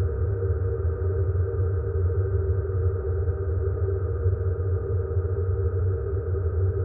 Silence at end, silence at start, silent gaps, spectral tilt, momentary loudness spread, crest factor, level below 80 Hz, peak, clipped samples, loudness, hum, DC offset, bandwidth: 0 s; 0 s; none; -9.5 dB/octave; 2 LU; 12 dB; -32 dBFS; -12 dBFS; under 0.1%; -26 LUFS; none; under 0.1%; 1.9 kHz